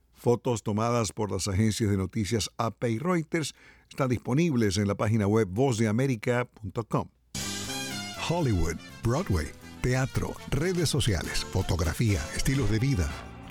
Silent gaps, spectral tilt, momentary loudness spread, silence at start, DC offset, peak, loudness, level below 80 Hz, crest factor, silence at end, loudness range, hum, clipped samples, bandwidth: none; -5.5 dB/octave; 7 LU; 0.2 s; under 0.1%; -12 dBFS; -28 LUFS; -40 dBFS; 16 dB; 0 s; 3 LU; none; under 0.1%; 17 kHz